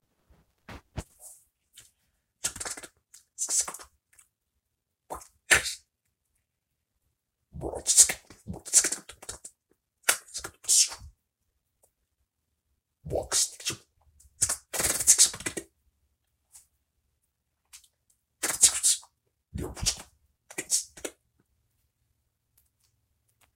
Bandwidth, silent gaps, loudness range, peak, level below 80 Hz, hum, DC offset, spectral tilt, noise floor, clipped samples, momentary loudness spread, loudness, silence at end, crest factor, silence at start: 16.5 kHz; none; 9 LU; -2 dBFS; -54 dBFS; none; under 0.1%; 0 dB/octave; -82 dBFS; under 0.1%; 23 LU; -24 LUFS; 2.45 s; 30 dB; 0.7 s